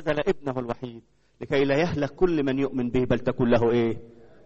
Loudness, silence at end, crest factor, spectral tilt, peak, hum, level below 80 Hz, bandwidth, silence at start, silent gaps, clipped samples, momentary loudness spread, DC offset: -25 LUFS; 0.2 s; 18 dB; -7.5 dB/octave; -8 dBFS; none; -44 dBFS; 7.8 kHz; 0 s; none; under 0.1%; 12 LU; under 0.1%